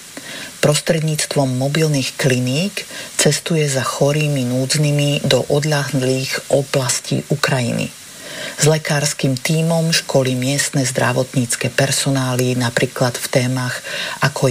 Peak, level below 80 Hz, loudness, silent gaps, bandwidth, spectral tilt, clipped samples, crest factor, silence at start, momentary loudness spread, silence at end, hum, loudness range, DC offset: -4 dBFS; -54 dBFS; -17 LUFS; none; 15.5 kHz; -4.5 dB/octave; under 0.1%; 14 dB; 0 s; 7 LU; 0 s; none; 2 LU; under 0.1%